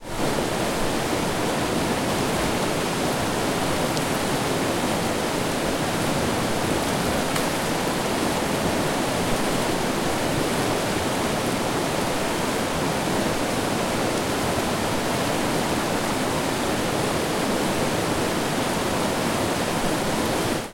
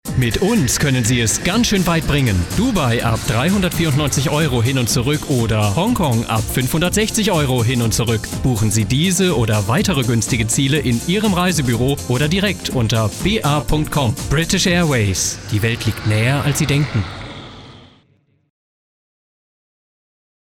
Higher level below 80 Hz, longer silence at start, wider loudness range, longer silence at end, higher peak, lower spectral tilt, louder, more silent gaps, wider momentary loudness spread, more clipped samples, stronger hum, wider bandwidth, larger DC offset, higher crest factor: second, -42 dBFS vs -32 dBFS; about the same, 0 s vs 0.05 s; second, 0 LU vs 4 LU; second, 0 s vs 2.8 s; second, -8 dBFS vs -4 dBFS; about the same, -4 dB/octave vs -4.5 dB/octave; second, -24 LUFS vs -17 LUFS; neither; second, 1 LU vs 4 LU; neither; neither; about the same, 16.5 kHz vs 18 kHz; neither; about the same, 16 dB vs 12 dB